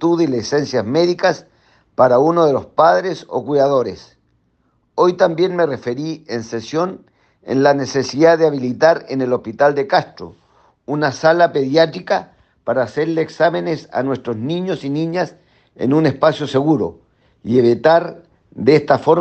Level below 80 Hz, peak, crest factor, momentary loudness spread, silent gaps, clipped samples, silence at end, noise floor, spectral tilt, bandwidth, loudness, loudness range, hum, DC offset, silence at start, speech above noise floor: -60 dBFS; 0 dBFS; 16 dB; 11 LU; none; under 0.1%; 0 s; -62 dBFS; -6 dB/octave; 8.4 kHz; -16 LUFS; 4 LU; none; under 0.1%; 0 s; 46 dB